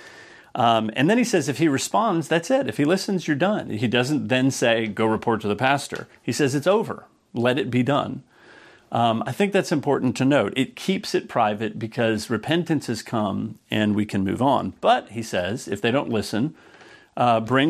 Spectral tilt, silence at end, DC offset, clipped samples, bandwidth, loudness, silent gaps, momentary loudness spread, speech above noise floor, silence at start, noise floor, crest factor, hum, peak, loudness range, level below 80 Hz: -5.5 dB/octave; 0 s; under 0.1%; under 0.1%; 14.5 kHz; -22 LUFS; none; 8 LU; 27 dB; 0 s; -49 dBFS; 18 dB; none; -4 dBFS; 3 LU; -64 dBFS